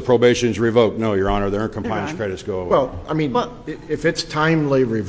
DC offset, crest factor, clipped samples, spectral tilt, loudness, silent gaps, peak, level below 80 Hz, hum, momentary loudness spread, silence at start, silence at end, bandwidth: under 0.1%; 18 dB; under 0.1%; -6 dB/octave; -20 LUFS; none; -2 dBFS; -40 dBFS; none; 9 LU; 0 s; 0 s; 8 kHz